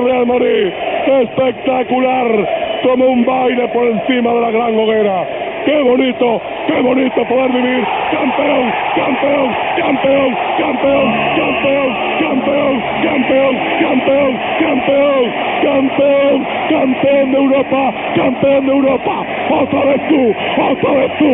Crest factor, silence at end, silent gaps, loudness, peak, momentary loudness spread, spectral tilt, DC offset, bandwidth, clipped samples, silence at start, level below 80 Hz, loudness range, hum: 12 dB; 0 s; none; -13 LUFS; 0 dBFS; 3 LU; -3 dB/octave; under 0.1%; 3.9 kHz; under 0.1%; 0 s; -48 dBFS; 1 LU; none